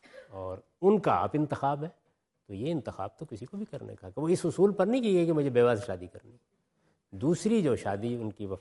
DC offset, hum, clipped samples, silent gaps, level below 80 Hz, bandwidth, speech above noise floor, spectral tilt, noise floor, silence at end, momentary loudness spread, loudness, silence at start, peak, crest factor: under 0.1%; none; under 0.1%; none; -68 dBFS; 11.5 kHz; 45 dB; -7 dB/octave; -73 dBFS; 0 s; 16 LU; -29 LUFS; 0.15 s; -12 dBFS; 18 dB